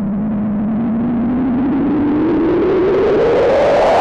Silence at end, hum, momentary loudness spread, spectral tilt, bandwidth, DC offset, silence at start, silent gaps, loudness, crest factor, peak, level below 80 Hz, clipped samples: 0 s; none; 6 LU; -8 dB/octave; 8.6 kHz; under 0.1%; 0 s; none; -14 LUFS; 6 dB; -6 dBFS; -36 dBFS; under 0.1%